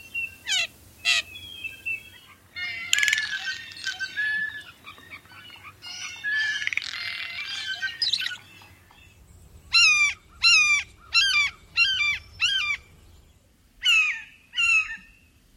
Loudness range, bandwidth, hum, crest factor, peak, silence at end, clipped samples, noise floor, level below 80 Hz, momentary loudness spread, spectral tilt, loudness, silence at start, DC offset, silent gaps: 10 LU; 16.5 kHz; none; 26 dB; -2 dBFS; 0.55 s; under 0.1%; -58 dBFS; -58 dBFS; 21 LU; 2 dB/octave; -23 LUFS; 0.05 s; under 0.1%; none